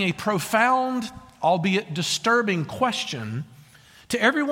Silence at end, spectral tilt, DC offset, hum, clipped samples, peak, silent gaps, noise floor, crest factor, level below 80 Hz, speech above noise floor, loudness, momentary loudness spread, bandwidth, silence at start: 0 s; -4 dB/octave; under 0.1%; none; under 0.1%; -6 dBFS; none; -51 dBFS; 18 dB; -60 dBFS; 28 dB; -23 LUFS; 11 LU; 16.5 kHz; 0 s